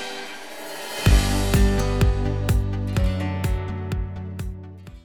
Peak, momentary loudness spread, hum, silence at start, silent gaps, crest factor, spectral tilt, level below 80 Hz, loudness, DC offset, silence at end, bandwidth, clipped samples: -4 dBFS; 15 LU; none; 0 s; none; 18 dB; -5.5 dB/octave; -26 dBFS; -24 LUFS; 0.4%; 0 s; 18.5 kHz; under 0.1%